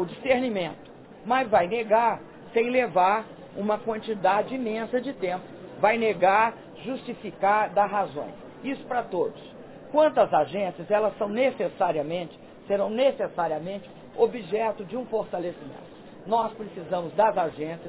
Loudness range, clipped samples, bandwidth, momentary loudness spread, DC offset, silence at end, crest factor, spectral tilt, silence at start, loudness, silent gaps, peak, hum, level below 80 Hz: 4 LU; under 0.1%; 4 kHz; 16 LU; under 0.1%; 0 s; 20 dB; -9 dB/octave; 0 s; -26 LUFS; none; -6 dBFS; none; -64 dBFS